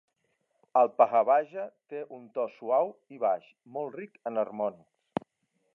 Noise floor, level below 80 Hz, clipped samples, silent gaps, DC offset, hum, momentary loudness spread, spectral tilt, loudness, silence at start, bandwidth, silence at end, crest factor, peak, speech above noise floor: -77 dBFS; -80 dBFS; under 0.1%; none; under 0.1%; none; 16 LU; -8 dB/octave; -29 LUFS; 0.75 s; 4.1 kHz; 1.05 s; 22 dB; -8 dBFS; 48 dB